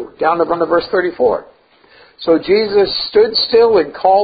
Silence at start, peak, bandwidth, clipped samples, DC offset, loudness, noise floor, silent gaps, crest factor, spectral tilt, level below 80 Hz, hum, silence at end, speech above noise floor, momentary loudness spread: 0 s; 0 dBFS; 5 kHz; under 0.1%; under 0.1%; -14 LUFS; -48 dBFS; none; 14 dB; -9.5 dB/octave; -48 dBFS; none; 0 s; 35 dB; 6 LU